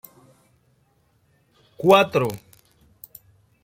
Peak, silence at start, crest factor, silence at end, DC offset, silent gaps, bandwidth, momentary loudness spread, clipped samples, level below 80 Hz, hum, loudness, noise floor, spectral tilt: -2 dBFS; 1.8 s; 22 dB; 1.25 s; under 0.1%; none; 16.5 kHz; 28 LU; under 0.1%; -62 dBFS; none; -19 LUFS; -64 dBFS; -5.5 dB/octave